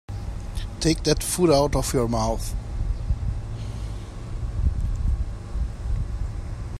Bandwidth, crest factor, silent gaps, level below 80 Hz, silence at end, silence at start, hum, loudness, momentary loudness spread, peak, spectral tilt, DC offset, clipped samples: 15 kHz; 20 dB; none; -28 dBFS; 0 s; 0.1 s; none; -26 LUFS; 13 LU; -4 dBFS; -5.5 dB/octave; under 0.1%; under 0.1%